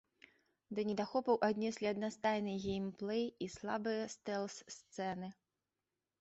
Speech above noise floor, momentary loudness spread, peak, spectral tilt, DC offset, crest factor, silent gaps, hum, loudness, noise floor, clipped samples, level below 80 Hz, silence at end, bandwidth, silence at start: over 51 dB; 11 LU; -20 dBFS; -4.5 dB/octave; under 0.1%; 20 dB; none; none; -39 LUFS; under -90 dBFS; under 0.1%; -72 dBFS; 0.9 s; 8 kHz; 0.7 s